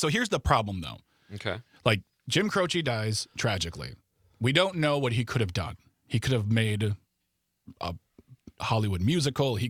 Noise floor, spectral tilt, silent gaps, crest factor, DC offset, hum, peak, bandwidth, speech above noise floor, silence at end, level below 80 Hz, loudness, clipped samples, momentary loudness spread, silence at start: -79 dBFS; -5 dB/octave; none; 24 dB; under 0.1%; none; -6 dBFS; 15.5 kHz; 51 dB; 0 s; -50 dBFS; -28 LUFS; under 0.1%; 13 LU; 0 s